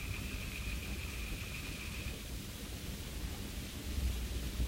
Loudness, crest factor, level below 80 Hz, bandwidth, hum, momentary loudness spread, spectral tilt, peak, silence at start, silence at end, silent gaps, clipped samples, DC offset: -42 LUFS; 16 dB; -42 dBFS; 16 kHz; none; 5 LU; -4 dB/octave; -24 dBFS; 0 s; 0 s; none; under 0.1%; under 0.1%